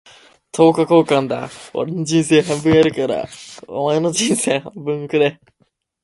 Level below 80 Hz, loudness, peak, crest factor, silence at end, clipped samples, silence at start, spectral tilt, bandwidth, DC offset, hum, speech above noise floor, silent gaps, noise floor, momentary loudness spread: -54 dBFS; -17 LUFS; 0 dBFS; 18 dB; 0.7 s; under 0.1%; 0.55 s; -5 dB/octave; 12 kHz; under 0.1%; none; 25 dB; none; -41 dBFS; 12 LU